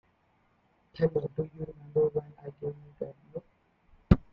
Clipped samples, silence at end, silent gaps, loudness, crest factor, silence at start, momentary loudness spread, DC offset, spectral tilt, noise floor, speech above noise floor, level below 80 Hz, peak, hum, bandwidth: under 0.1%; 0.15 s; none; -32 LUFS; 30 dB; 0.95 s; 18 LU; under 0.1%; -11 dB/octave; -69 dBFS; 37 dB; -44 dBFS; -4 dBFS; none; 5.4 kHz